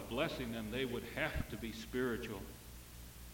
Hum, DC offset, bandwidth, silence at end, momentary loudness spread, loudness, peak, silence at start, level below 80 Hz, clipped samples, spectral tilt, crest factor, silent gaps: 60 Hz at -55 dBFS; under 0.1%; 17 kHz; 0 s; 14 LU; -41 LUFS; -22 dBFS; 0 s; -52 dBFS; under 0.1%; -5 dB/octave; 20 dB; none